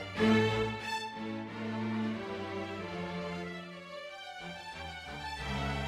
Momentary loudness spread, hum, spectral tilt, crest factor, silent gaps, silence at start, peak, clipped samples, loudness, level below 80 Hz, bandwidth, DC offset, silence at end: 15 LU; none; -6 dB/octave; 20 dB; none; 0 s; -16 dBFS; under 0.1%; -36 LUFS; -52 dBFS; 13 kHz; under 0.1%; 0 s